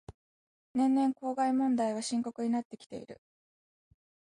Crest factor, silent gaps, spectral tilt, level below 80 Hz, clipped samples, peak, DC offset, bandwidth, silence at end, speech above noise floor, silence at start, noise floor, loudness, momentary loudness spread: 14 dB; 0.14-0.74 s, 2.65-2.70 s, 2.86-2.90 s; -5 dB/octave; -68 dBFS; under 0.1%; -18 dBFS; under 0.1%; 11 kHz; 1.15 s; over 59 dB; 0.1 s; under -90 dBFS; -31 LUFS; 18 LU